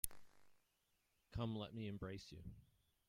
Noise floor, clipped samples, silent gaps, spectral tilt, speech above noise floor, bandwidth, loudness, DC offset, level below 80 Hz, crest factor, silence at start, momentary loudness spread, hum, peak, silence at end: -83 dBFS; under 0.1%; none; -5 dB/octave; 35 dB; 16 kHz; -50 LUFS; under 0.1%; -64 dBFS; 34 dB; 0.05 s; 13 LU; none; -18 dBFS; 0.45 s